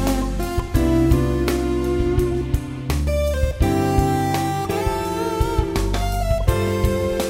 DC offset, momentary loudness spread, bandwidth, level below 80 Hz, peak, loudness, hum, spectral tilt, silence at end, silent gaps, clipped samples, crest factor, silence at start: under 0.1%; 5 LU; 16 kHz; -24 dBFS; -2 dBFS; -21 LUFS; none; -6.5 dB/octave; 0 s; none; under 0.1%; 16 dB; 0 s